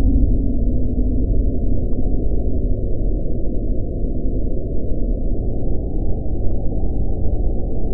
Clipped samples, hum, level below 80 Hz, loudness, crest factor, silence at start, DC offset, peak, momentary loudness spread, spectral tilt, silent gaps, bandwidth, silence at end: under 0.1%; none; -20 dBFS; -23 LUFS; 12 dB; 0 s; 4%; -4 dBFS; 4 LU; -16 dB/octave; none; 0.9 kHz; 0 s